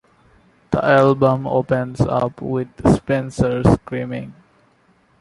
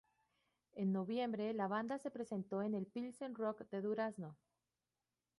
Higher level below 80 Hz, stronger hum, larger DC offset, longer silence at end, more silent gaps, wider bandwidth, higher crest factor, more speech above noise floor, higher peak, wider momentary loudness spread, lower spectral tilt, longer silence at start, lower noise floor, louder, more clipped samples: first, -38 dBFS vs -86 dBFS; neither; neither; second, 0.9 s vs 1.05 s; neither; about the same, 11.5 kHz vs 11.5 kHz; about the same, 18 dB vs 16 dB; second, 40 dB vs over 48 dB; first, -2 dBFS vs -28 dBFS; first, 12 LU vs 7 LU; about the same, -8 dB/octave vs -7.5 dB/octave; about the same, 0.7 s vs 0.75 s; second, -57 dBFS vs under -90 dBFS; first, -18 LUFS vs -42 LUFS; neither